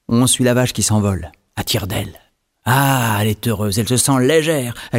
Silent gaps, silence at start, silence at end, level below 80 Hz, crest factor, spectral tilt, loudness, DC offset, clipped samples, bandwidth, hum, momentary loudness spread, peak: none; 0.1 s; 0 s; -44 dBFS; 16 dB; -4.5 dB/octave; -16 LUFS; under 0.1%; under 0.1%; 16.5 kHz; none; 12 LU; 0 dBFS